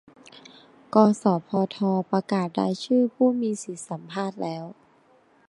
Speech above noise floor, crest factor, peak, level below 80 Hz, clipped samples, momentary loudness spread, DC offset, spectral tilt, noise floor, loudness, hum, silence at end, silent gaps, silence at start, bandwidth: 36 dB; 22 dB; -4 dBFS; -74 dBFS; under 0.1%; 13 LU; under 0.1%; -6.5 dB/octave; -59 dBFS; -24 LUFS; none; 0.75 s; none; 0.95 s; 11 kHz